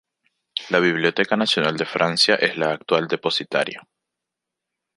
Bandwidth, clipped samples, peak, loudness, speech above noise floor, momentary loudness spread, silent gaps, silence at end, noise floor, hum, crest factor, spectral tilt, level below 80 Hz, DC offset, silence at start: 11.5 kHz; under 0.1%; -2 dBFS; -20 LUFS; 63 dB; 9 LU; none; 1.15 s; -84 dBFS; none; 20 dB; -4 dB/octave; -68 dBFS; under 0.1%; 0.55 s